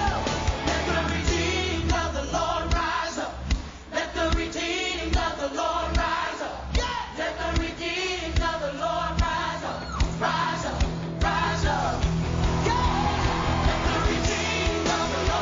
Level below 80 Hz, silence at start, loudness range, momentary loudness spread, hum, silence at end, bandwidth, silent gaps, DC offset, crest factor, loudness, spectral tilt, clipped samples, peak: -32 dBFS; 0 s; 3 LU; 5 LU; none; 0 s; 7.6 kHz; none; under 0.1%; 14 dB; -26 LUFS; -4.5 dB/octave; under 0.1%; -12 dBFS